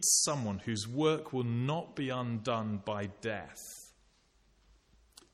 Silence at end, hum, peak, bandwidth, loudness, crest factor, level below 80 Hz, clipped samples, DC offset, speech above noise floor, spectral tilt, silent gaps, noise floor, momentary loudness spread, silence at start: 1.45 s; none; -14 dBFS; 15 kHz; -34 LUFS; 20 dB; -68 dBFS; under 0.1%; under 0.1%; 35 dB; -3.5 dB/octave; none; -68 dBFS; 12 LU; 0 s